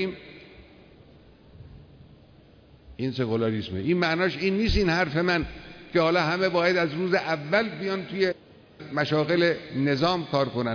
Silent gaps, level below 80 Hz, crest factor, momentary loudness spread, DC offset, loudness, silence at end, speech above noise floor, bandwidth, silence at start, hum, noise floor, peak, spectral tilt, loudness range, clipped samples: none; -44 dBFS; 16 dB; 10 LU; under 0.1%; -25 LUFS; 0 s; 29 dB; 5.4 kHz; 0 s; none; -53 dBFS; -10 dBFS; -6.5 dB/octave; 9 LU; under 0.1%